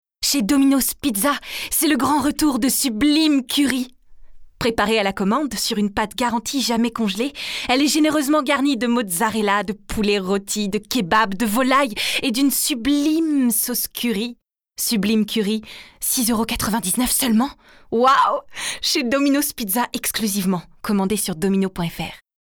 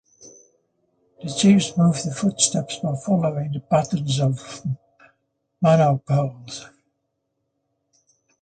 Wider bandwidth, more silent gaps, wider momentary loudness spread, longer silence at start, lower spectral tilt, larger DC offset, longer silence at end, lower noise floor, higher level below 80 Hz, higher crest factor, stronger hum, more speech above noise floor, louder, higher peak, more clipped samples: first, over 20 kHz vs 9.4 kHz; neither; second, 7 LU vs 14 LU; about the same, 0.2 s vs 0.25 s; second, -3.5 dB/octave vs -5.5 dB/octave; neither; second, 0.25 s vs 1.75 s; second, -39 dBFS vs -76 dBFS; first, -46 dBFS vs -60 dBFS; about the same, 16 dB vs 20 dB; neither; second, 19 dB vs 55 dB; about the same, -19 LUFS vs -21 LUFS; about the same, -4 dBFS vs -2 dBFS; neither